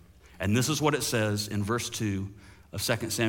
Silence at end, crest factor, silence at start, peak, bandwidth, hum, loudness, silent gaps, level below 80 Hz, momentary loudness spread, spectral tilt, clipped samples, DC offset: 0 s; 18 dB; 0.25 s; -10 dBFS; 17 kHz; none; -29 LUFS; none; -58 dBFS; 9 LU; -4.5 dB/octave; under 0.1%; under 0.1%